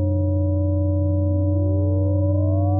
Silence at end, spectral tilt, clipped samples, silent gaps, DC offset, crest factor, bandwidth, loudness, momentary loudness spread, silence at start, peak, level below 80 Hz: 0 s; -19 dB/octave; under 0.1%; none; under 0.1%; 8 dB; 1.2 kHz; -21 LUFS; 1 LU; 0 s; -10 dBFS; -38 dBFS